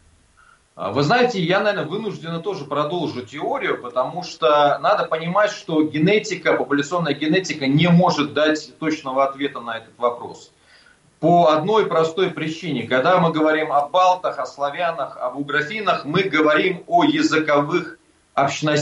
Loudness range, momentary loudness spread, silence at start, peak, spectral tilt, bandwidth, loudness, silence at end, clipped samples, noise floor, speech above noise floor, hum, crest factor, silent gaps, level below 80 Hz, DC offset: 3 LU; 10 LU; 0.75 s; -6 dBFS; -5.5 dB/octave; 10.5 kHz; -20 LUFS; 0 s; under 0.1%; -54 dBFS; 35 dB; none; 14 dB; none; -62 dBFS; under 0.1%